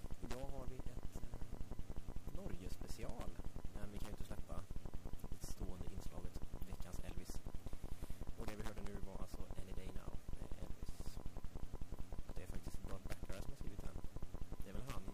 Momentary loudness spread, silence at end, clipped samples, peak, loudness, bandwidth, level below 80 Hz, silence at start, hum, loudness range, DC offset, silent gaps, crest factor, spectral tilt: 3 LU; 0 s; under 0.1%; -30 dBFS; -53 LUFS; 15.5 kHz; -50 dBFS; 0 s; none; 1 LU; 0.3%; none; 10 dB; -6 dB/octave